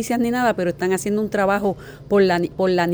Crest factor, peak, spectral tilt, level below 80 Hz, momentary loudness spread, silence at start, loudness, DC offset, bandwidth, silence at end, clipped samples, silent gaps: 14 dB; -6 dBFS; -5.5 dB/octave; -50 dBFS; 5 LU; 0 s; -20 LUFS; under 0.1%; over 20 kHz; 0 s; under 0.1%; none